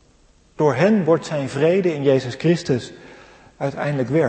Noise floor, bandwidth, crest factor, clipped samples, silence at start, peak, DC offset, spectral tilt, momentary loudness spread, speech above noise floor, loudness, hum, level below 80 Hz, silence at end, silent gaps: -54 dBFS; 8.8 kHz; 16 dB; under 0.1%; 0.6 s; -4 dBFS; under 0.1%; -7 dB/octave; 8 LU; 36 dB; -20 LUFS; none; -56 dBFS; 0 s; none